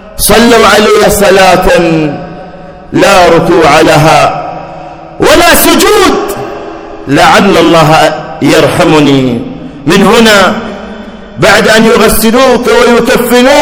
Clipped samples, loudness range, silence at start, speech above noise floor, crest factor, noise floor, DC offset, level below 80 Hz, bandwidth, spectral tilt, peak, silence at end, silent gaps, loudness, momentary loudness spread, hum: 20%; 2 LU; 0 s; 22 dB; 6 dB; -25 dBFS; under 0.1%; -26 dBFS; over 20 kHz; -4 dB/octave; 0 dBFS; 0 s; none; -4 LUFS; 18 LU; none